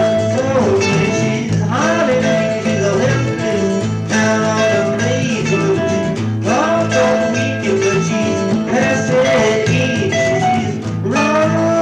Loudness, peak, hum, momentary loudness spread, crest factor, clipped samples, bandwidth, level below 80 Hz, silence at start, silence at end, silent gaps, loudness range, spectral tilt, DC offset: -15 LUFS; -2 dBFS; none; 4 LU; 12 dB; under 0.1%; 10.5 kHz; -46 dBFS; 0 s; 0 s; none; 1 LU; -5.5 dB/octave; under 0.1%